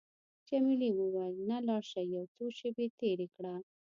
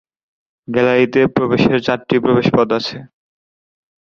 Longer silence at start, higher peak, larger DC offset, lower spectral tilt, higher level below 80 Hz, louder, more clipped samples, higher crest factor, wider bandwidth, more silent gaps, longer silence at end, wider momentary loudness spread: second, 0.5 s vs 0.7 s; second, -22 dBFS vs 0 dBFS; neither; about the same, -7 dB/octave vs -7 dB/octave; second, -86 dBFS vs -50 dBFS; second, -36 LUFS vs -15 LUFS; neither; about the same, 14 dB vs 16 dB; about the same, 7.4 kHz vs 7 kHz; first, 2.28-2.35 s, 2.90-2.98 s vs none; second, 0.35 s vs 1.1 s; first, 11 LU vs 8 LU